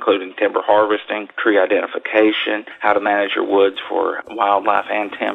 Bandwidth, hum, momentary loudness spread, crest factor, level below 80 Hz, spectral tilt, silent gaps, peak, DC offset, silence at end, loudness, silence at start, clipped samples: 4.2 kHz; none; 6 LU; 18 dB; -66 dBFS; -6 dB/octave; none; 0 dBFS; under 0.1%; 0 s; -17 LUFS; 0 s; under 0.1%